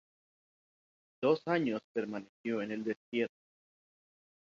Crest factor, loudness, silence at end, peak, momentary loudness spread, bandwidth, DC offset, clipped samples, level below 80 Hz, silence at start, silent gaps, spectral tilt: 20 dB; -35 LUFS; 1.15 s; -16 dBFS; 8 LU; 7.4 kHz; under 0.1%; under 0.1%; -80 dBFS; 1.2 s; 1.84-1.95 s, 2.29-2.44 s, 2.96-3.12 s; -5 dB/octave